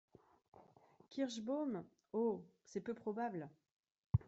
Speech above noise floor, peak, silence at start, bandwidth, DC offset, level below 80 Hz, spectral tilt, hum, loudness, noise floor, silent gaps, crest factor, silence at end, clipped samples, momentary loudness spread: 25 dB; -20 dBFS; 0.55 s; 8 kHz; under 0.1%; -64 dBFS; -7.5 dB/octave; none; -44 LUFS; -67 dBFS; 4.06-4.10 s; 24 dB; 0.05 s; under 0.1%; 10 LU